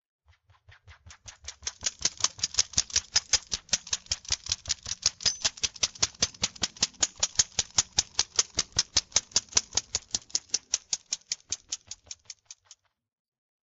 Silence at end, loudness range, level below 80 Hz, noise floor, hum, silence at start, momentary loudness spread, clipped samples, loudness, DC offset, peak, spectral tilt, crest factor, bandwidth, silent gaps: 1.1 s; 5 LU; -54 dBFS; -63 dBFS; none; 0.9 s; 12 LU; under 0.1%; -28 LUFS; under 0.1%; -6 dBFS; 1 dB/octave; 26 dB; 8.4 kHz; none